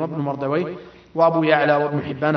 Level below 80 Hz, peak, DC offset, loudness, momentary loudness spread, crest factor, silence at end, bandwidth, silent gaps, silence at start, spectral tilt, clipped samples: -60 dBFS; -2 dBFS; under 0.1%; -20 LUFS; 14 LU; 18 dB; 0 s; 6.2 kHz; none; 0 s; -8.5 dB/octave; under 0.1%